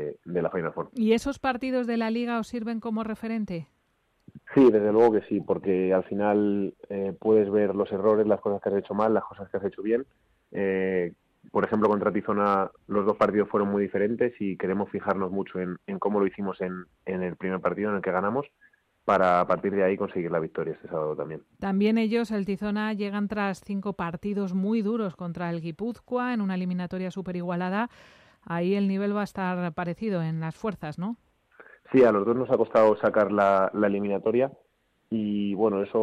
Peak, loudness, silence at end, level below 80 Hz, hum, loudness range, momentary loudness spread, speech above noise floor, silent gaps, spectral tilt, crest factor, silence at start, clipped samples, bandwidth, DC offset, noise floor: -10 dBFS; -26 LUFS; 0 s; -62 dBFS; none; 6 LU; 11 LU; 45 dB; none; -8 dB/octave; 16 dB; 0 s; under 0.1%; 11 kHz; under 0.1%; -71 dBFS